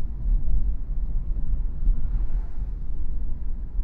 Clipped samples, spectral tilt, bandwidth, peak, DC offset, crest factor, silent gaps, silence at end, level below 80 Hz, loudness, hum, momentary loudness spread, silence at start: under 0.1%; -11 dB/octave; 1.4 kHz; -10 dBFS; under 0.1%; 12 dB; none; 0 s; -24 dBFS; -31 LUFS; none; 6 LU; 0 s